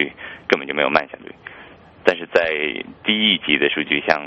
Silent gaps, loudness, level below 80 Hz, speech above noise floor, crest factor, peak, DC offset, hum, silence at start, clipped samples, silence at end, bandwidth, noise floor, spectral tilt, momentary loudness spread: none; -19 LUFS; -56 dBFS; 24 dB; 20 dB; 0 dBFS; under 0.1%; none; 0 s; under 0.1%; 0 s; 8.2 kHz; -44 dBFS; -4.5 dB/octave; 20 LU